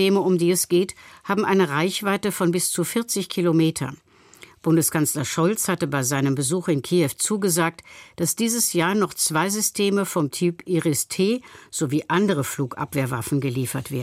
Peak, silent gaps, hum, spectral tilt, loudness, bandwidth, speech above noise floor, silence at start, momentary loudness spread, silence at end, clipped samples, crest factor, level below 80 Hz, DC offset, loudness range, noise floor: -8 dBFS; none; none; -4.5 dB/octave; -22 LUFS; 16.5 kHz; 27 dB; 0 s; 7 LU; 0 s; under 0.1%; 16 dB; -62 dBFS; under 0.1%; 2 LU; -49 dBFS